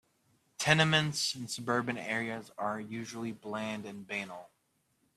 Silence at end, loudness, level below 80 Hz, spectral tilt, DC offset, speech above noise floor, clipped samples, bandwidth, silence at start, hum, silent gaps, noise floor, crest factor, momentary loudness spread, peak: 0.7 s; -32 LUFS; -70 dBFS; -4 dB/octave; under 0.1%; 42 dB; under 0.1%; 14 kHz; 0.6 s; none; none; -76 dBFS; 28 dB; 14 LU; -8 dBFS